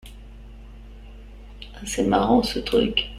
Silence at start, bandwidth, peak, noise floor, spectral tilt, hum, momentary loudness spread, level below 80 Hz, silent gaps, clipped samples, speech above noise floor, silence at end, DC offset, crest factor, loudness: 0.05 s; 14.5 kHz; -6 dBFS; -41 dBFS; -4.5 dB/octave; none; 24 LU; -40 dBFS; none; under 0.1%; 20 dB; 0 s; under 0.1%; 20 dB; -21 LUFS